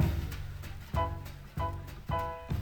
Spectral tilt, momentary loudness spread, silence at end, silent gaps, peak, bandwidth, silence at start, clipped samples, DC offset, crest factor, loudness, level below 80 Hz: -7 dB/octave; 9 LU; 0 s; none; -16 dBFS; over 20 kHz; 0 s; under 0.1%; under 0.1%; 20 dB; -37 LUFS; -40 dBFS